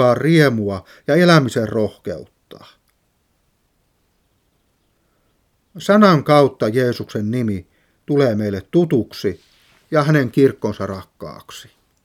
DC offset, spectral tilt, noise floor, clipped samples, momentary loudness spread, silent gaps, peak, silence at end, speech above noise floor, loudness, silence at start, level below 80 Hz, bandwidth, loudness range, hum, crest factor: under 0.1%; -7 dB/octave; -64 dBFS; under 0.1%; 19 LU; none; 0 dBFS; 0.45 s; 48 dB; -17 LUFS; 0 s; -56 dBFS; 15.5 kHz; 8 LU; none; 18 dB